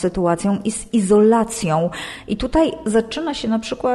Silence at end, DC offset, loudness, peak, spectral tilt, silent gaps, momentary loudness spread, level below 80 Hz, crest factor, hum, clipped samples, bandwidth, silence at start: 0 s; under 0.1%; -19 LUFS; -4 dBFS; -5.5 dB/octave; none; 10 LU; -38 dBFS; 14 dB; none; under 0.1%; 12.5 kHz; 0 s